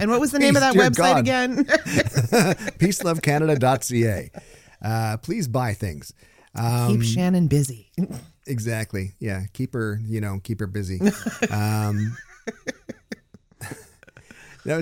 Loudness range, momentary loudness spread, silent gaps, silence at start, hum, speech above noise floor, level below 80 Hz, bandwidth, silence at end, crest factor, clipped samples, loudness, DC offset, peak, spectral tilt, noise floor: 9 LU; 20 LU; none; 0 s; none; 28 dB; -50 dBFS; 17 kHz; 0 s; 18 dB; under 0.1%; -22 LUFS; under 0.1%; -4 dBFS; -5.5 dB/octave; -50 dBFS